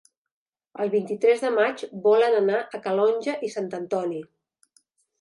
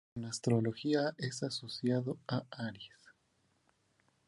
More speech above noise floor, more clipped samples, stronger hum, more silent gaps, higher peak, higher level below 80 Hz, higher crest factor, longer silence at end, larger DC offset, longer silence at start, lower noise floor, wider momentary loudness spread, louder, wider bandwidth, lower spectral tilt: about the same, 43 dB vs 40 dB; neither; neither; neither; first, -8 dBFS vs -18 dBFS; second, -82 dBFS vs -72 dBFS; about the same, 16 dB vs 20 dB; second, 0.95 s vs 1.4 s; neither; first, 0.75 s vs 0.15 s; second, -66 dBFS vs -76 dBFS; about the same, 11 LU vs 11 LU; first, -24 LUFS vs -36 LUFS; about the same, 11 kHz vs 11.5 kHz; about the same, -5.5 dB/octave vs -5.5 dB/octave